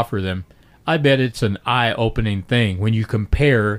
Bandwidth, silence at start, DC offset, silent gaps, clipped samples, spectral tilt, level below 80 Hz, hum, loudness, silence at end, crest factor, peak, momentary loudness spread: 15 kHz; 0 s; under 0.1%; none; under 0.1%; -6.5 dB/octave; -32 dBFS; none; -19 LUFS; 0 s; 14 dB; -4 dBFS; 8 LU